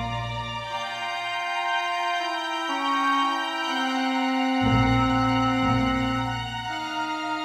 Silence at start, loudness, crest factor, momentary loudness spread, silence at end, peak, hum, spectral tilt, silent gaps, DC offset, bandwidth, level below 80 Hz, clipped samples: 0 s; -25 LUFS; 16 dB; 8 LU; 0 s; -10 dBFS; none; -5 dB/octave; none; under 0.1%; 13.5 kHz; -42 dBFS; under 0.1%